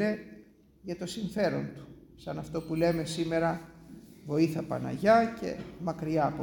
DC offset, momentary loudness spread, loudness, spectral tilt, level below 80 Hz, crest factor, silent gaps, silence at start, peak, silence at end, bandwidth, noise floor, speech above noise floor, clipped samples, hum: under 0.1%; 23 LU; -31 LUFS; -6.5 dB/octave; -58 dBFS; 20 dB; none; 0 s; -12 dBFS; 0 s; 17 kHz; -56 dBFS; 26 dB; under 0.1%; none